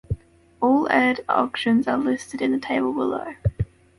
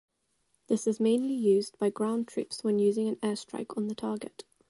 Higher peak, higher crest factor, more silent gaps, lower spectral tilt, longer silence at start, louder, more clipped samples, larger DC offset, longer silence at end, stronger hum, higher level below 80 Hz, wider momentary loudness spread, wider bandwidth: first, -4 dBFS vs -14 dBFS; about the same, 18 dB vs 14 dB; neither; about the same, -6.5 dB/octave vs -6 dB/octave; second, 0.1 s vs 0.7 s; first, -22 LUFS vs -30 LUFS; neither; neither; about the same, 0.35 s vs 0.4 s; neither; first, -42 dBFS vs -76 dBFS; about the same, 9 LU vs 9 LU; about the same, 11.5 kHz vs 11.5 kHz